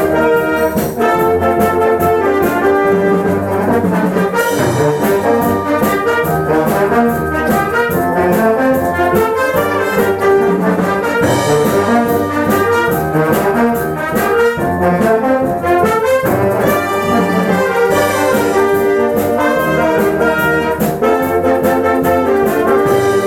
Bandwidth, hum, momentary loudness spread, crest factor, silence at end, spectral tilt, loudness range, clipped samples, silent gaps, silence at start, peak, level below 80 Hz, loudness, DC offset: 19 kHz; none; 2 LU; 12 dB; 0 s; -6 dB/octave; 1 LU; under 0.1%; none; 0 s; -2 dBFS; -38 dBFS; -13 LUFS; 0.1%